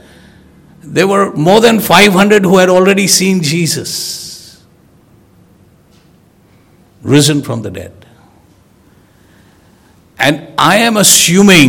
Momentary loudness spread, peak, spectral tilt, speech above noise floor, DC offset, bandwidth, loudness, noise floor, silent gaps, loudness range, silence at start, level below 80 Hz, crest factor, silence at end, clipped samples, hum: 16 LU; 0 dBFS; -3.5 dB/octave; 38 dB; under 0.1%; over 20 kHz; -9 LUFS; -46 dBFS; none; 12 LU; 0.85 s; -48 dBFS; 12 dB; 0 s; 2%; none